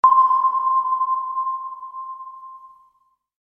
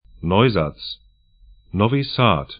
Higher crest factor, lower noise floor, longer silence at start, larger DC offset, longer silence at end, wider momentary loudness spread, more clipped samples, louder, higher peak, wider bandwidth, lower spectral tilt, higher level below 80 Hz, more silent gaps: about the same, 18 dB vs 20 dB; first, -64 dBFS vs -51 dBFS; second, 0.05 s vs 0.2 s; neither; first, 0.75 s vs 0.05 s; first, 21 LU vs 16 LU; neither; about the same, -19 LUFS vs -19 LUFS; second, -4 dBFS vs 0 dBFS; second, 3.3 kHz vs 5.2 kHz; second, -4 dB/octave vs -11.5 dB/octave; second, -74 dBFS vs -44 dBFS; neither